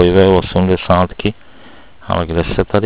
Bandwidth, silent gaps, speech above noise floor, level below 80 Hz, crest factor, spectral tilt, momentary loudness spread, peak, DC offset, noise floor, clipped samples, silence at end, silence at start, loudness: 4 kHz; none; 29 dB; -28 dBFS; 14 dB; -11 dB/octave; 10 LU; 0 dBFS; 2%; -42 dBFS; 0.2%; 0 s; 0 s; -14 LUFS